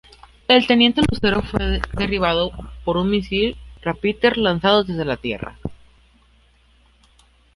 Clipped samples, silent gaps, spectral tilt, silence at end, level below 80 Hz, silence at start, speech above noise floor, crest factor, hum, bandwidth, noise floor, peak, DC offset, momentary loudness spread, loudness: under 0.1%; none; -6 dB/octave; 1.8 s; -36 dBFS; 0.5 s; 36 dB; 20 dB; none; 11.5 kHz; -55 dBFS; -2 dBFS; under 0.1%; 14 LU; -19 LUFS